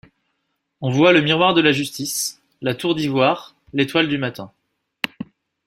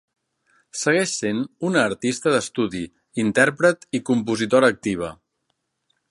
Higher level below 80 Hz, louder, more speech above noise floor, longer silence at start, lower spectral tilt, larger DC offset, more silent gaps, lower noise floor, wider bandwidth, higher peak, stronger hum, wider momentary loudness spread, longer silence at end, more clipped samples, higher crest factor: about the same, -60 dBFS vs -58 dBFS; about the same, -19 LUFS vs -21 LUFS; about the same, 55 dB vs 53 dB; about the same, 0.8 s vs 0.75 s; about the same, -4.5 dB/octave vs -4.5 dB/octave; neither; neither; about the same, -73 dBFS vs -74 dBFS; first, 16 kHz vs 11.5 kHz; about the same, -2 dBFS vs 0 dBFS; neither; first, 14 LU vs 10 LU; second, 0.4 s vs 0.95 s; neither; about the same, 20 dB vs 22 dB